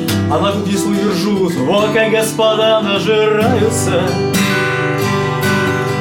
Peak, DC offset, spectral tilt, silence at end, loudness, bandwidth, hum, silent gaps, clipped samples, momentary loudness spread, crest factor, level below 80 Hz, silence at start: -2 dBFS; under 0.1%; -5 dB/octave; 0 s; -14 LUFS; 17.5 kHz; none; none; under 0.1%; 3 LU; 12 dB; -50 dBFS; 0 s